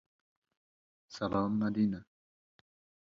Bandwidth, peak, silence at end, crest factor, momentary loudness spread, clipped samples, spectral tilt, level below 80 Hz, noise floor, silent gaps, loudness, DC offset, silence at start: 7.2 kHz; -20 dBFS; 1.15 s; 18 dB; 13 LU; under 0.1%; -7.5 dB/octave; -66 dBFS; under -90 dBFS; none; -33 LUFS; under 0.1%; 1.1 s